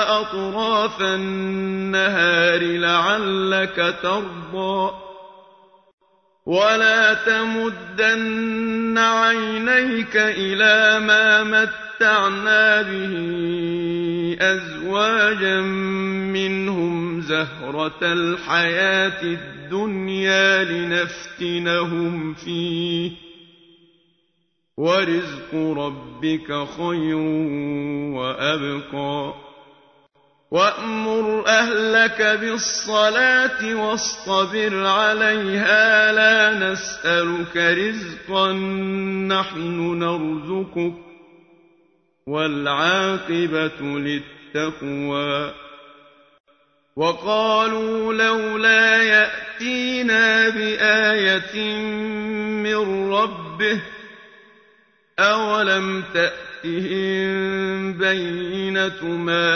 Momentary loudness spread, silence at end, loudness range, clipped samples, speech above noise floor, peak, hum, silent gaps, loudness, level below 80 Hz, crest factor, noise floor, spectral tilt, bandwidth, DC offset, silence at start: 11 LU; 0 s; 9 LU; under 0.1%; 51 dB; -2 dBFS; none; 5.93-5.98 s, 46.40-46.44 s; -19 LUFS; -58 dBFS; 18 dB; -70 dBFS; -4 dB/octave; 6.6 kHz; under 0.1%; 0 s